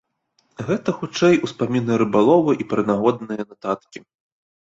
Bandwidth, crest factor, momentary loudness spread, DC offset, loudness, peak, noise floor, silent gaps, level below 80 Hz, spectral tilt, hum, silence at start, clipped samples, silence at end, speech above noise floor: 7.8 kHz; 18 dB; 12 LU; under 0.1%; -20 LUFS; -2 dBFS; -66 dBFS; none; -60 dBFS; -6.5 dB/octave; none; 0.6 s; under 0.1%; 0.7 s; 47 dB